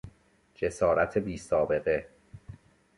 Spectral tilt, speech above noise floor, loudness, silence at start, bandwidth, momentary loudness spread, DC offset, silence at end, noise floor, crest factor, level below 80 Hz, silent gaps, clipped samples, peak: -6 dB/octave; 35 dB; -29 LUFS; 0.05 s; 11.5 kHz; 12 LU; under 0.1%; 0.45 s; -63 dBFS; 18 dB; -52 dBFS; none; under 0.1%; -12 dBFS